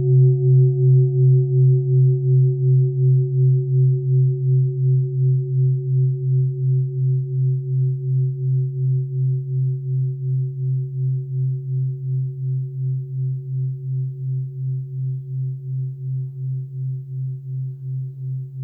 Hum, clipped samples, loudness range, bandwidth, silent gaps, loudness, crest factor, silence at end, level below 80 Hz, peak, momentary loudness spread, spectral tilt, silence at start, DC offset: none; under 0.1%; 10 LU; 0.7 kHz; none; -20 LUFS; 12 dB; 0 s; -66 dBFS; -8 dBFS; 12 LU; -16.5 dB/octave; 0 s; under 0.1%